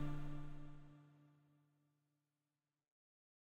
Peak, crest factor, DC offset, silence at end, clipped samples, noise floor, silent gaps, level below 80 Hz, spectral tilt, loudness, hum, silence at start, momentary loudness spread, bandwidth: -32 dBFS; 18 dB; under 0.1%; 2.2 s; under 0.1%; under -90 dBFS; none; -56 dBFS; -8 dB/octave; -53 LUFS; none; 0 s; 17 LU; 4.4 kHz